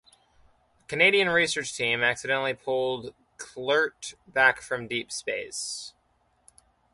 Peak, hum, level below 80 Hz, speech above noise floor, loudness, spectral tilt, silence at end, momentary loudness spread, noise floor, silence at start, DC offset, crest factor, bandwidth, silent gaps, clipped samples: -6 dBFS; none; -66 dBFS; 42 dB; -25 LUFS; -2.5 dB/octave; 1.05 s; 16 LU; -68 dBFS; 0.9 s; under 0.1%; 22 dB; 11.5 kHz; none; under 0.1%